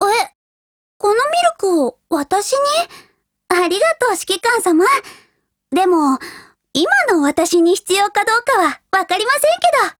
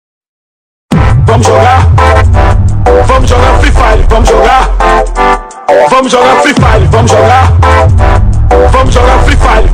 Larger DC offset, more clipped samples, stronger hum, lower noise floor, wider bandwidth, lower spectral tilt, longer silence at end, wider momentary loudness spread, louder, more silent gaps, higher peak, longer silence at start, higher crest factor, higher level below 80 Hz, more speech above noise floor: neither; second, under 0.1% vs 20%; neither; second, -61 dBFS vs under -90 dBFS; first, 19.5 kHz vs 11.5 kHz; second, -1.5 dB/octave vs -6 dB/octave; about the same, 0.05 s vs 0 s; about the same, 6 LU vs 4 LU; second, -15 LUFS vs -6 LUFS; first, 0.35-1.00 s vs none; about the same, -2 dBFS vs 0 dBFS; second, 0 s vs 0.9 s; first, 14 dB vs 4 dB; second, -58 dBFS vs -10 dBFS; second, 46 dB vs over 86 dB